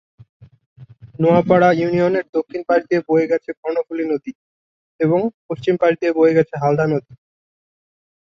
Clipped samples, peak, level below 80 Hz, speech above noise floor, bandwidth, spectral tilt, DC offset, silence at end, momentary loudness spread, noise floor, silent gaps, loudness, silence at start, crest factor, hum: under 0.1%; -2 dBFS; -58 dBFS; over 73 dB; 6.8 kHz; -8.5 dB/octave; under 0.1%; 1.15 s; 10 LU; under -90 dBFS; 0.66-0.76 s, 2.29-2.33 s, 3.57-3.63 s, 4.35-4.99 s, 5.34-5.49 s; -18 LUFS; 0.4 s; 18 dB; none